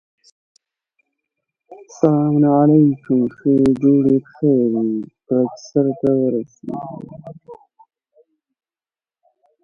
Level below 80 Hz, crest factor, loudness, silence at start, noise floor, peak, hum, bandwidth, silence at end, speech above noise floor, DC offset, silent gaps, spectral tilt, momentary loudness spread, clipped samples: -58 dBFS; 18 dB; -17 LUFS; 1.7 s; under -90 dBFS; 0 dBFS; none; 7 kHz; 2.1 s; over 74 dB; under 0.1%; none; -9.5 dB/octave; 16 LU; under 0.1%